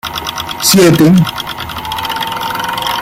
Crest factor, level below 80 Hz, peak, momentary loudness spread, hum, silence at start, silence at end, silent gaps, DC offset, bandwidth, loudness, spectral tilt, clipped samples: 12 dB; -40 dBFS; 0 dBFS; 13 LU; none; 0.05 s; 0 s; none; under 0.1%; 16.5 kHz; -12 LUFS; -4.5 dB/octave; under 0.1%